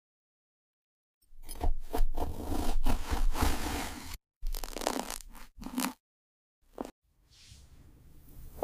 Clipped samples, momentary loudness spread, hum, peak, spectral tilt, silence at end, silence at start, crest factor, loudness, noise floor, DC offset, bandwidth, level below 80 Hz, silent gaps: under 0.1%; 23 LU; none; -10 dBFS; -4.5 dB/octave; 0 s; 1.3 s; 22 dB; -37 LUFS; -59 dBFS; under 0.1%; 16 kHz; -34 dBFS; 4.36-4.41 s, 6.00-6.62 s, 6.92-7.02 s